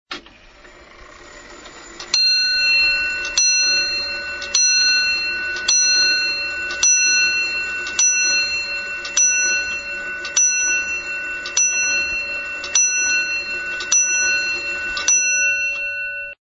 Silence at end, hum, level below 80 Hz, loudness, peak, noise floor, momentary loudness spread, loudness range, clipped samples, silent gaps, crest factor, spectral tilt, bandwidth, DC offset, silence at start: 0.1 s; none; -50 dBFS; -16 LUFS; 0 dBFS; -45 dBFS; 10 LU; 3 LU; under 0.1%; none; 18 dB; 3 dB/octave; 9.6 kHz; under 0.1%; 0.1 s